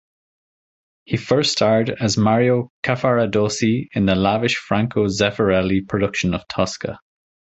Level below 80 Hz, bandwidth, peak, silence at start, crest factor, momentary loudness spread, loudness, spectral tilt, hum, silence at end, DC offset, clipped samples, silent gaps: -44 dBFS; 8.2 kHz; -2 dBFS; 1.1 s; 18 dB; 7 LU; -19 LUFS; -5.5 dB/octave; none; 0.6 s; under 0.1%; under 0.1%; 2.70-2.83 s